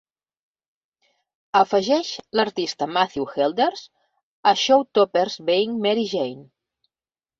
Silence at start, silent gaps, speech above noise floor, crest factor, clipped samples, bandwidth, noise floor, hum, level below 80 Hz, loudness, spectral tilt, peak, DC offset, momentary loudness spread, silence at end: 1.55 s; 4.23-4.43 s; over 69 dB; 20 dB; under 0.1%; 7.6 kHz; under -90 dBFS; none; -68 dBFS; -21 LUFS; -4 dB/octave; -4 dBFS; under 0.1%; 7 LU; 0.95 s